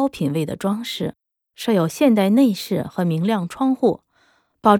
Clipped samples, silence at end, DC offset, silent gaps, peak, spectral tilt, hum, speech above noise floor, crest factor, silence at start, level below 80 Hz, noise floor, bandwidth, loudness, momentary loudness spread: under 0.1%; 0 s; under 0.1%; none; -2 dBFS; -6.5 dB/octave; none; 42 dB; 18 dB; 0 s; -58 dBFS; -61 dBFS; 19 kHz; -20 LUFS; 10 LU